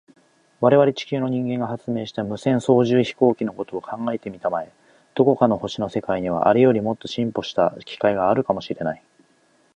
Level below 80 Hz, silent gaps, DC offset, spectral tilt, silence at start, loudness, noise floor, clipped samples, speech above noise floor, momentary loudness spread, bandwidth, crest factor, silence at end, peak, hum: -58 dBFS; none; under 0.1%; -7 dB/octave; 0.6 s; -21 LUFS; -60 dBFS; under 0.1%; 40 dB; 11 LU; 10 kHz; 18 dB; 0.8 s; -2 dBFS; none